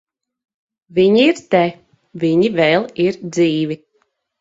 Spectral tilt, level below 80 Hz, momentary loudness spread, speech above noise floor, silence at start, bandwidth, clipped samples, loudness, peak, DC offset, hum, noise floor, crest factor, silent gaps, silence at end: -6 dB/octave; -60 dBFS; 9 LU; 50 dB; 0.95 s; 7.8 kHz; under 0.1%; -16 LUFS; 0 dBFS; under 0.1%; none; -65 dBFS; 18 dB; none; 0.65 s